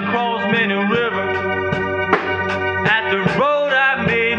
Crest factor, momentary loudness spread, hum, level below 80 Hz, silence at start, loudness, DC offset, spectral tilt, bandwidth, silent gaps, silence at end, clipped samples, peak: 18 dB; 5 LU; none; -52 dBFS; 0 s; -17 LUFS; under 0.1%; -6.5 dB/octave; 8.8 kHz; none; 0 s; under 0.1%; 0 dBFS